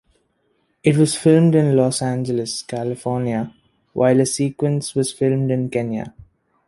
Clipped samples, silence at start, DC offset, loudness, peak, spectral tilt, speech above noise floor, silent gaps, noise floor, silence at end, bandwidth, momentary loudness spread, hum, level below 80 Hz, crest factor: under 0.1%; 0.85 s; under 0.1%; -19 LUFS; -2 dBFS; -6 dB/octave; 48 dB; none; -66 dBFS; 0.45 s; 11.5 kHz; 12 LU; none; -56 dBFS; 16 dB